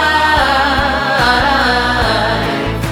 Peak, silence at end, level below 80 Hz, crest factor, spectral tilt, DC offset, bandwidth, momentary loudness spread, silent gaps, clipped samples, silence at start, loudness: 0 dBFS; 0 s; -26 dBFS; 12 dB; -4.5 dB/octave; under 0.1%; 19 kHz; 5 LU; none; under 0.1%; 0 s; -12 LUFS